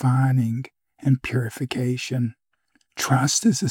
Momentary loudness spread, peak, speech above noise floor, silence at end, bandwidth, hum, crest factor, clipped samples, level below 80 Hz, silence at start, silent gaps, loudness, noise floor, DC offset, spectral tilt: 10 LU; -6 dBFS; 46 dB; 0 s; 16.5 kHz; none; 16 dB; under 0.1%; -58 dBFS; 0 s; none; -23 LUFS; -68 dBFS; under 0.1%; -5 dB/octave